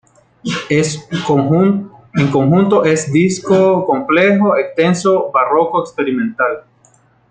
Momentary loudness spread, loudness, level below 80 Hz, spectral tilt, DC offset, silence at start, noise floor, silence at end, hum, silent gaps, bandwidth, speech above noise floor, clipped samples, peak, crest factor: 9 LU; -14 LUFS; -54 dBFS; -6 dB/octave; under 0.1%; 0.45 s; -52 dBFS; 0.7 s; none; none; 9.4 kHz; 39 dB; under 0.1%; 0 dBFS; 14 dB